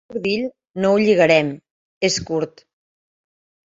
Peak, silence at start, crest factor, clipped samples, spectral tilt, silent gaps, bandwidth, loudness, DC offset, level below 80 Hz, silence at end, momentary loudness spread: -2 dBFS; 0.1 s; 20 dB; under 0.1%; -4.5 dB/octave; 1.71-2.01 s; 7.8 kHz; -19 LUFS; under 0.1%; -56 dBFS; 1.3 s; 14 LU